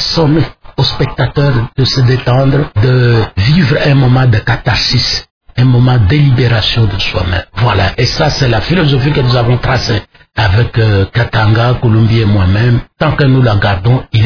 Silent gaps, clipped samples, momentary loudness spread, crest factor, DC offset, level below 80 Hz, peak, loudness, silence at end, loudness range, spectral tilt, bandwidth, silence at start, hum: 5.31-5.41 s; under 0.1%; 5 LU; 10 dB; under 0.1%; -26 dBFS; 0 dBFS; -10 LUFS; 0 s; 2 LU; -6.5 dB/octave; 5.4 kHz; 0 s; none